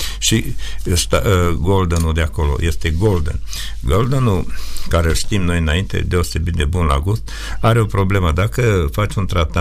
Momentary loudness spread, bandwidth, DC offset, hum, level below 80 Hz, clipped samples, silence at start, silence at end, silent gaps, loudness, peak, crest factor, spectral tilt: 7 LU; 15.5 kHz; under 0.1%; none; -24 dBFS; under 0.1%; 0 s; 0 s; none; -17 LUFS; -2 dBFS; 14 dB; -5 dB/octave